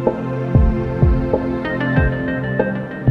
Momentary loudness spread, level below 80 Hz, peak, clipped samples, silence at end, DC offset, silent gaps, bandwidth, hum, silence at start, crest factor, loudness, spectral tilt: 5 LU; -24 dBFS; -2 dBFS; under 0.1%; 0 s; under 0.1%; none; 5.6 kHz; none; 0 s; 16 dB; -19 LUFS; -10 dB/octave